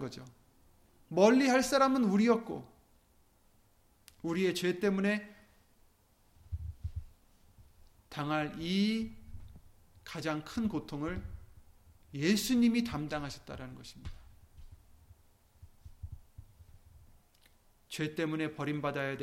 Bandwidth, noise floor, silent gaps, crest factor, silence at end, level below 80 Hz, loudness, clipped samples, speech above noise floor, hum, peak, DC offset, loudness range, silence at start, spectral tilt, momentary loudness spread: 16.5 kHz; -67 dBFS; none; 22 dB; 0 s; -54 dBFS; -32 LUFS; under 0.1%; 36 dB; none; -12 dBFS; under 0.1%; 16 LU; 0 s; -5.5 dB/octave; 23 LU